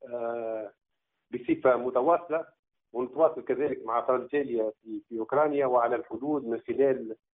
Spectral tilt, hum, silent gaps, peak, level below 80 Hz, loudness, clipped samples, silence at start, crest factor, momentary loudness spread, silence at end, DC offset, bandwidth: -1.5 dB/octave; none; 2.59-2.63 s; -10 dBFS; -72 dBFS; -28 LUFS; under 0.1%; 0.05 s; 20 dB; 12 LU; 0.2 s; under 0.1%; 3.9 kHz